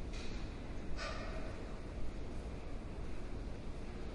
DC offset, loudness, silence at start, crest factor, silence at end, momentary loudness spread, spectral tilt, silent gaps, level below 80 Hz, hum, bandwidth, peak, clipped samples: under 0.1%; -47 LUFS; 0 s; 14 dB; 0 s; 4 LU; -6 dB/octave; none; -46 dBFS; none; 11 kHz; -28 dBFS; under 0.1%